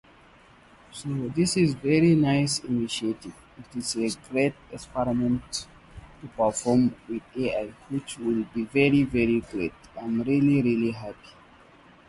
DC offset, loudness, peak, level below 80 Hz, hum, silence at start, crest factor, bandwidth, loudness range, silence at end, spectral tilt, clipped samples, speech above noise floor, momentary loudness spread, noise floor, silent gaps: under 0.1%; -26 LUFS; -8 dBFS; -52 dBFS; none; 0.95 s; 18 dB; 11.5 kHz; 4 LU; 0.8 s; -5.5 dB/octave; under 0.1%; 29 dB; 17 LU; -54 dBFS; none